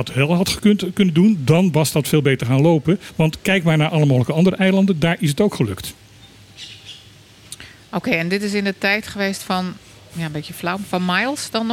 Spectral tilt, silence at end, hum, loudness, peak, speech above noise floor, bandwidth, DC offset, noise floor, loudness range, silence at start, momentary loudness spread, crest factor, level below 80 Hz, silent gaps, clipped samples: -6 dB/octave; 0 s; none; -18 LUFS; -4 dBFS; 28 dB; 17 kHz; under 0.1%; -45 dBFS; 8 LU; 0 s; 18 LU; 16 dB; -50 dBFS; none; under 0.1%